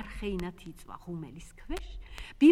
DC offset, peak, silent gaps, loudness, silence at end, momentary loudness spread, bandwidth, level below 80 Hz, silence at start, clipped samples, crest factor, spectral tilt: under 0.1%; -10 dBFS; none; -34 LUFS; 0 s; 11 LU; 13 kHz; -44 dBFS; 0 s; under 0.1%; 20 dB; -6.5 dB/octave